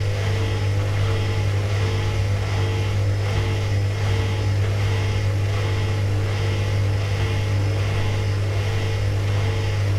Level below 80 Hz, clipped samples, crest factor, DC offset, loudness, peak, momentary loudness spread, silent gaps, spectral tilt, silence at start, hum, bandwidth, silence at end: -34 dBFS; under 0.1%; 10 dB; under 0.1%; -22 LUFS; -10 dBFS; 1 LU; none; -6 dB/octave; 0 s; none; 11.5 kHz; 0 s